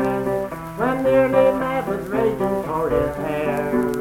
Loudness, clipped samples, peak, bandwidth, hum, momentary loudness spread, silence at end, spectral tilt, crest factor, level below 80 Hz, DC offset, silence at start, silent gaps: -21 LUFS; under 0.1%; -4 dBFS; 16.5 kHz; none; 8 LU; 0 s; -7 dB/octave; 16 dB; -42 dBFS; under 0.1%; 0 s; none